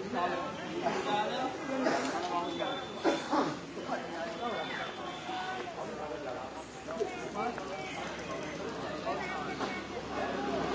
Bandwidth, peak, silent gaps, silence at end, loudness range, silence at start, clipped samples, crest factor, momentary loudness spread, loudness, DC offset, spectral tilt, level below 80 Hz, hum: 8 kHz; -16 dBFS; none; 0 s; 5 LU; 0 s; under 0.1%; 20 dB; 7 LU; -36 LUFS; under 0.1%; -4.5 dB/octave; -62 dBFS; none